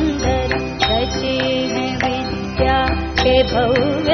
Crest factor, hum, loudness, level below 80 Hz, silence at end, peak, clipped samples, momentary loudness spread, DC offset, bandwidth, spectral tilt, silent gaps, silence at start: 16 dB; none; -18 LUFS; -28 dBFS; 0 s; 0 dBFS; under 0.1%; 5 LU; under 0.1%; 6.6 kHz; -3.5 dB/octave; none; 0 s